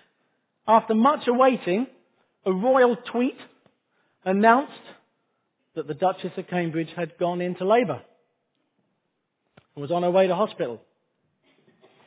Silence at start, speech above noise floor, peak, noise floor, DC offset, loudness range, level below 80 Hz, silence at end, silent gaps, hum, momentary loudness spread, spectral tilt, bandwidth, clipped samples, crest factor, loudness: 0.65 s; 54 dB; -2 dBFS; -77 dBFS; under 0.1%; 6 LU; -76 dBFS; 1.3 s; none; none; 15 LU; -10 dB/octave; 4 kHz; under 0.1%; 22 dB; -23 LUFS